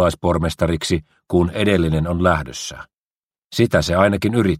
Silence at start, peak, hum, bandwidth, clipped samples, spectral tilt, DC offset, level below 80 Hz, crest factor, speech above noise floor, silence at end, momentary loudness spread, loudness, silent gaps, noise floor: 0 s; 0 dBFS; none; 16 kHz; under 0.1%; -6 dB/octave; under 0.1%; -36 dBFS; 18 dB; over 72 dB; 0 s; 12 LU; -19 LUFS; 2.97-3.27 s, 3.38-3.50 s; under -90 dBFS